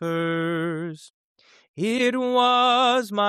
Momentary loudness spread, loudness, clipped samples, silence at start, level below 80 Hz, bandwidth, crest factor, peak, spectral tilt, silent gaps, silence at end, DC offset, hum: 13 LU; -22 LUFS; under 0.1%; 0 s; -76 dBFS; 14.5 kHz; 14 dB; -8 dBFS; -4.5 dB/octave; 1.10-1.35 s, 1.68-1.74 s; 0 s; under 0.1%; none